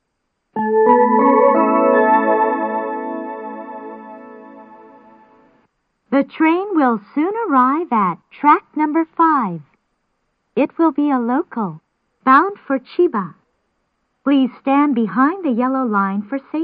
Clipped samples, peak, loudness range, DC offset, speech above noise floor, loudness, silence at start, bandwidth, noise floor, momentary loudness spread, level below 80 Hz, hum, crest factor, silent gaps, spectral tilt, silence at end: under 0.1%; 0 dBFS; 8 LU; under 0.1%; 55 dB; -16 LUFS; 0.55 s; 4.9 kHz; -72 dBFS; 14 LU; -68 dBFS; none; 16 dB; none; -10.5 dB/octave; 0 s